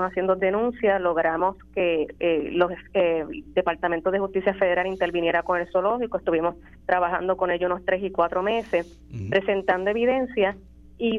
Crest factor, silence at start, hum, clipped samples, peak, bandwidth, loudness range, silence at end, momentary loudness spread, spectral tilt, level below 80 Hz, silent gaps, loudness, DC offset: 18 dB; 0 s; none; under 0.1%; -6 dBFS; 6.8 kHz; 1 LU; 0 s; 4 LU; -7.5 dB/octave; -50 dBFS; none; -24 LUFS; under 0.1%